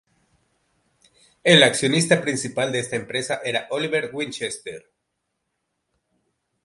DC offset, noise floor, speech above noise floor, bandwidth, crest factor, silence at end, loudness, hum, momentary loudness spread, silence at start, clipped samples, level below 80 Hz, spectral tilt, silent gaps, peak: under 0.1%; -77 dBFS; 56 dB; 11.5 kHz; 24 dB; 1.85 s; -21 LUFS; none; 15 LU; 1.45 s; under 0.1%; -66 dBFS; -3.5 dB/octave; none; 0 dBFS